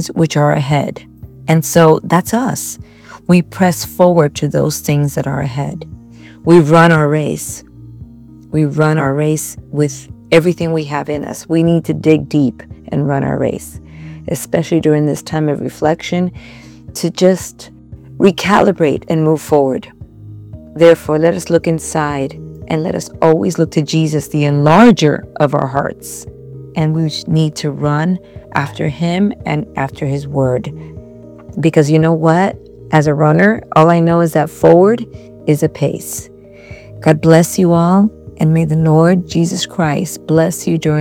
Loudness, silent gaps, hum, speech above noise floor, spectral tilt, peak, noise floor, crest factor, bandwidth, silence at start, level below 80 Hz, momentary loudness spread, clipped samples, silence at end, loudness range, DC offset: -13 LUFS; none; none; 24 dB; -6.5 dB/octave; 0 dBFS; -37 dBFS; 14 dB; 16.5 kHz; 0 s; -44 dBFS; 15 LU; 0.5%; 0 s; 5 LU; under 0.1%